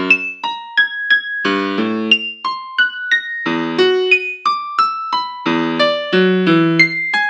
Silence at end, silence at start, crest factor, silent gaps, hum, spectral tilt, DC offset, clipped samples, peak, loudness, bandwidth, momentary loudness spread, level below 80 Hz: 0 s; 0 s; 16 dB; none; none; -5.5 dB/octave; under 0.1%; under 0.1%; 0 dBFS; -15 LUFS; 9.2 kHz; 7 LU; -74 dBFS